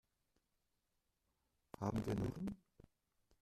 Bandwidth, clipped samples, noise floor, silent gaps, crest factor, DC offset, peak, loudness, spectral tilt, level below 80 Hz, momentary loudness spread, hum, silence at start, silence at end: 14.5 kHz; under 0.1%; -86 dBFS; none; 22 dB; under 0.1%; -26 dBFS; -44 LUFS; -7.5 dB/octave; -64 dBFS; 16 LU; none; 1.8 s; 0.85 s